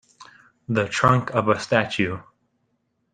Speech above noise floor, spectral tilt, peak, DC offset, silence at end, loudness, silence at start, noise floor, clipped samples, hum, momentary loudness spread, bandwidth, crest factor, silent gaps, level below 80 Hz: 50 dB; -5.5 dB/octave; -2 dBFS; under 0.1%; 0.95 s; -22 LUFS; 0.2 s; -71 dBFS; under 0.1%; none; 8 LU; 9.6 kHz; 22 dB; none; -56 dBFS